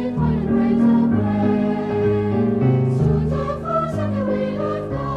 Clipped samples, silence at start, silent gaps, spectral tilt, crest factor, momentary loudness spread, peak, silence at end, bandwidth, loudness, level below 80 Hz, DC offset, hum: under 0.1%; 0 s; none; -10 dB/octave; 12 dB; 6 LU; -6 dBFS; 0 s; 7 kHz; -19 LUFS; -36 dBFS; under 0.1%; none